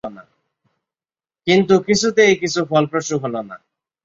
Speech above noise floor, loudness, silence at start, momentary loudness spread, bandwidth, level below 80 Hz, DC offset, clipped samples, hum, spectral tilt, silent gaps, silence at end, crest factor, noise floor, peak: over 73 dB; -17 LUFS; 0.05 s; 14 LU; 7.8 kHz; -56 dBFS; under 0.1%; under 0.1%; none; -4.5 dB/octave; none; 0.5 s; 18 dB; under -90 dBFS; -2 dBFS